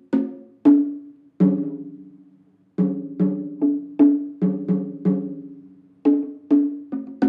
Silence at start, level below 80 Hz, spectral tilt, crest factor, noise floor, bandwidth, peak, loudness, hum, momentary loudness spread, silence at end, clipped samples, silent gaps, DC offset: 0.1 s; -72 dBFS; -11.5 dB/octave; 18 dB; -56 dBFS; 3 kHz; -4 dBFS; -22 LUFS; none; 16 LU; 0 s; under 0.1%; none; under 0.1%